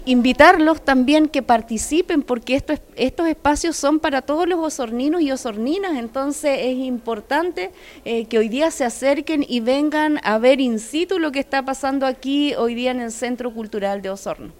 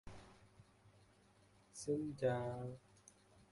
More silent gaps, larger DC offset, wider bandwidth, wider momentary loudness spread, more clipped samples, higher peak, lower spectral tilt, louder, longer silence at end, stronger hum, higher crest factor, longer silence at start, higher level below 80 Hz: neither; neither; first, 16 kHz vs 11.5 kHz; second, 9 LU vs 26 LU; neither; first, 0 dBFS vs -26 dBFS; second, -3.5 dB/octave vs -6.5 dB/octave; first, -19 LUFS vs -43 LUFS; about the same, 0.1 s vs 0.1 s; neither; about the same, 20 dB vs 20 dB; about the same, 0 s vs 0.05 s; first, -46 dBFS vs -70 dBFS